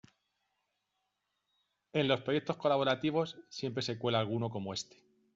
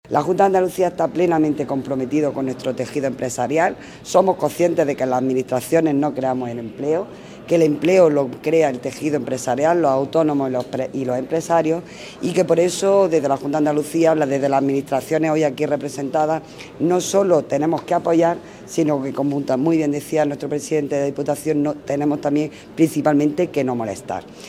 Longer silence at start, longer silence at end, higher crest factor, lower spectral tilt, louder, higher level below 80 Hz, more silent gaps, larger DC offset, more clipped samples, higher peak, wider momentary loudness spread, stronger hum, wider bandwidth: first, 1.95 s vs 0.1 s; first, 0.55 s vs 0 s; about the same, 20 dB vs 18 dB; second, -4 dB/octave vs -6 dB/octave; second, -34 LUFS vs -19 LUFS; second, -74 dBFS vs -58 dBFS; neither; neither; neither; second, -14 dBFS vs 0 dBFS; about the same, 10 LU vs 8 LU; neither; second, 7.8 kHz vs 16 kHz